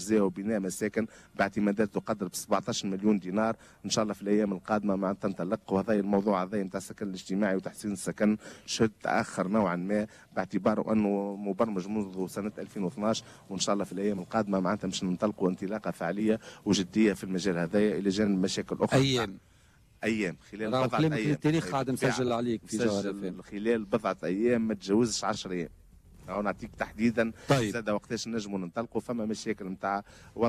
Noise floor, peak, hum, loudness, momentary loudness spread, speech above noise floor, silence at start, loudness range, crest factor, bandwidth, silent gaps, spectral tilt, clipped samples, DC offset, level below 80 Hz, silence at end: -60 dBFS; -16 dBFS; none; -30 LUFS; 8 LU; 31 dB; 0 s; 3 LU; 14 dB; 14 kHz; none; -5.5 dB/octave; under 0.1%; under 0.1%; -60 dBFS; 0 s